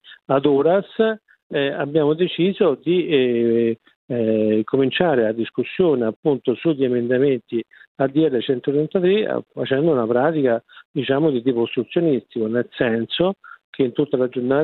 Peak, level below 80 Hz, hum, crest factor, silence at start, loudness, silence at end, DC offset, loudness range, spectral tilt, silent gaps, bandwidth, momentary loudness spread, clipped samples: 0 dBFS; -62 dBFS; none; 18 dB; 0.05 s; -20 LUFS; 0 s; under 0.1%; 2 LU; -10.5 dB/octave; 1.43-1.50 s, 3.96-4.08 s, 6.16-6.23 s, 7.87-7.95 s, 10.85-10.94 s, 13.64-13.73 s; 4.3 kHz; 6 LU; under 0.1%